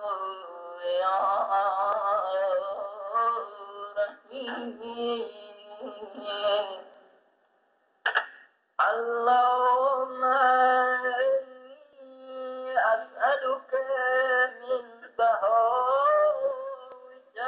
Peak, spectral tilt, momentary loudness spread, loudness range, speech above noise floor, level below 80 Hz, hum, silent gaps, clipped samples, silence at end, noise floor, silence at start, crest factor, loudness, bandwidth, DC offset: -12 dBFS; 2 dB/octave; 18 LU; 9 LU; 42 dB; -78 dBFS; none; none; under 0.1%; 0 s; -69 dBFS; 0 s; 16 dB; -26 LUFS; 4.8 kHz; under 0.1%